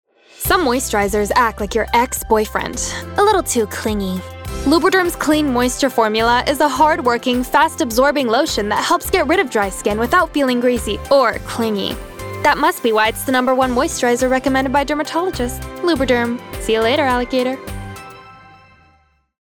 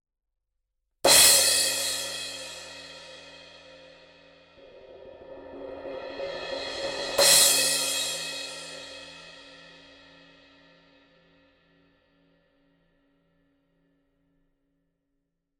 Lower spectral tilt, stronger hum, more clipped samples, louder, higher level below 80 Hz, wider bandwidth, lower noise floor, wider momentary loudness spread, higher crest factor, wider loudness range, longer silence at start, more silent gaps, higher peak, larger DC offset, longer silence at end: first, -3.5 dB/octave vs 1 dB/octave; neither; neither; first, -16 LUFS vs -21 LUFS; first, -36 dBFS vs -62 dBFS; first, over 20 kHz vs 16.5 kHz; second, -56 dBFS vs -83 dBFS; second, 8 LU vs 28 LU; second, 14 dB vs 26 dB; second, 3 LU vs 22 LU; second, 0.4 s vs 1.05 s; neither; about the same, -2 dBFS vs -4 dBFS; neither; second, 1.1 s vs 6.05 s